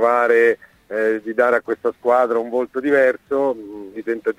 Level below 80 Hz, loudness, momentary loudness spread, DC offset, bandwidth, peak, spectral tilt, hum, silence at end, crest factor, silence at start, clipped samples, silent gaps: -64 dBFS; -19 LUFS; 13 LU; under 0.1%; 12 kHz; -2 dBFS; -6 dB/octave; none; 0.05 s; 16 dB; 0 s; under 0.1%; none